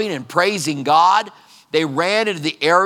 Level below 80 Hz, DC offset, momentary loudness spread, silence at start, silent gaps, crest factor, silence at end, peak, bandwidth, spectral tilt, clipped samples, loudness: -76 dBFS; under 0.1%; 8 LU; 0 s; none; 16 dB; 0 s; 0 dBFS; 17.5 kHz; -3.5 dB/octave; under 0.1%; -17 LUFS